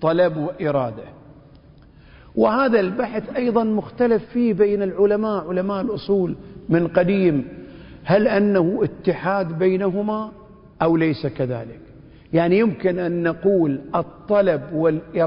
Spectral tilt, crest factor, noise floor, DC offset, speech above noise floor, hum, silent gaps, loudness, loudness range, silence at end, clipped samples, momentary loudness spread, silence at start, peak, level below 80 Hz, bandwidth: -12 dB/octave; 18 dB; -47 dBFS; under 0.1%; 28 dB; none; none; -20 LUFS; 3 LU; 0 s; under 0.1%; 8 LU; 0 s; -4 dBFS; -52 dBFS; 5.4 kHz